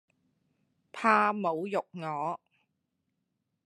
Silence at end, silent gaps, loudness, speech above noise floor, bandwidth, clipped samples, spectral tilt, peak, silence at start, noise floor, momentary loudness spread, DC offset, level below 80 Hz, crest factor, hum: 1.3 s; none; -29 LUFS; 52 dB; 12 kHz; under 0.1%; -6 dB/octave; -8 dBFS; 0.95 s; -81 dBFS; 14 LU; under 0.1%; -88 dBFS; 24 dB; none